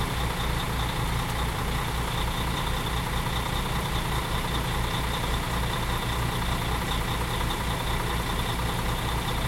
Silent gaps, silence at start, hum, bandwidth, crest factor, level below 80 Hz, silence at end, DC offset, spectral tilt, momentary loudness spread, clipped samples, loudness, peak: none; 0 s; none; 16.5 kHz; 14 dB; -32 dBFS; 0 s; under 0.1%; -4.5 dB/octave; 1 LU; under 0.1%; -28 LUFS; -14 dBFS